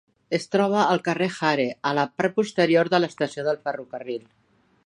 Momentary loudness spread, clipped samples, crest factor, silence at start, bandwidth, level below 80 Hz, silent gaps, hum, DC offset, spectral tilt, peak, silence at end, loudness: 13 LU; under 0.1%; 18 dB; 0.3 s; 11 kHz; -70 dBFS; none; none; under 0.1%; -5.5 dB/octave; -6 dBFS; 0.65 s; -23 LUFS